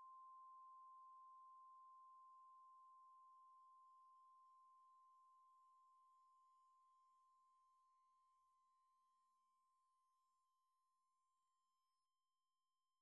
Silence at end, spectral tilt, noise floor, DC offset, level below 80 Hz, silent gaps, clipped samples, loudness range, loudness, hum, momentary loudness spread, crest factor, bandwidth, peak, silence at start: 0.95 s; 3.5 dB/octave; under -90 dBFS; under 0.1%; under -90 dBFS; none; under 0.1%; 4 LU; -66 LUFS; none; 6 LU; 10 dB; 3.1 kHz; -60 dBFS; 0 s